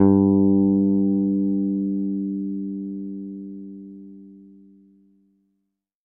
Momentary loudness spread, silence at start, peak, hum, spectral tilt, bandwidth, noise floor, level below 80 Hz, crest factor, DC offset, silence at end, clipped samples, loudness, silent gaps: 22 LU; 0 s; -2 dBFS; 50 Hz at -70 dBFS; -15.5 dB/octave; 1.7 kHz; -77 dBFS; -62 dBFS; 20 dB; under 0.1%; 1.65 s; under 0.1%; -21 LUFS; none